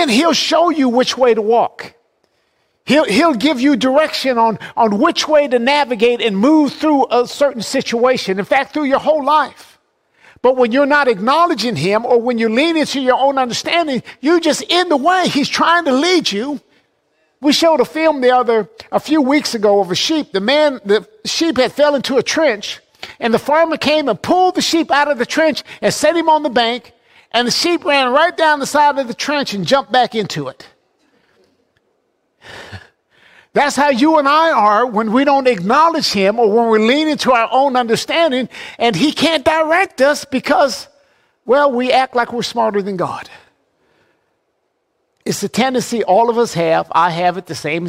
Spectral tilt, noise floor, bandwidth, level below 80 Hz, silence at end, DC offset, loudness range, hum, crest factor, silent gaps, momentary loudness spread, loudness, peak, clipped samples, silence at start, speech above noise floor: -4 dB/octave; -67 dBFS; 16 kHz; -56 dBFS; 0 s; under 0.1%; 5 LU; none; 14 dB; none; 7 LU; -14 LUFS; -2 dBFS; under 0.1%; 0 s; 53 dB